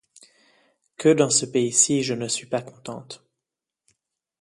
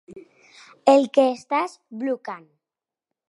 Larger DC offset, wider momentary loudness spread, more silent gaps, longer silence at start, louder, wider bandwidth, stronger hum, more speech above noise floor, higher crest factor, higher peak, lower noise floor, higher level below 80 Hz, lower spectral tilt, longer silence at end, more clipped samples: neither; first, 20 LU vs 16 LU; neither; first, 1 s vs 0.1 s; about the same, -21 LUFS vs -21 LUFS; about the same, 11.5 kHz vs 11.5 kHz; neither; second, 64 dB vs 69 dB; about the same, 22 dB vs 22 dB; about the same, -4 dBFS vs -2 dBFS; about the same, -86 dBFS vs -89 dBFS; first, -68 dBFS vs -76 dBFS; about the same, -3.5 dB/octave vs -4.5 dB/octave; first, 1.25 s vs 0.9 s; neither